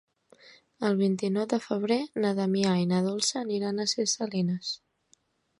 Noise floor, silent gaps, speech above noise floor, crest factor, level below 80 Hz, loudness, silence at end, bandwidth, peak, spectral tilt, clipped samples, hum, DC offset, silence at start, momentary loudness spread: -67 dBFS; none; 40 dB; 18 dB; -72 dBFS; -28 LUFS; 0.85 s; 11.5 kHz; -12 dBFS; -5 dB/octave; under 0.1%; none; under 0.1%; 0.45 s; 5 LU